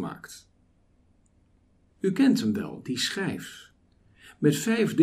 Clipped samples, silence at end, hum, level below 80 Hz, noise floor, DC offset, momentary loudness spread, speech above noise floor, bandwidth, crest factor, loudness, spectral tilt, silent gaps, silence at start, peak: under 0.1%; 0 s; none; -66 dBFS; -63 dBFS; under 0.1%; 21 LU; 38 dB; 15.5 kHz; 20 dB; -27 LUFS; -5 dB/octave; none; 0 s; -8 dBFS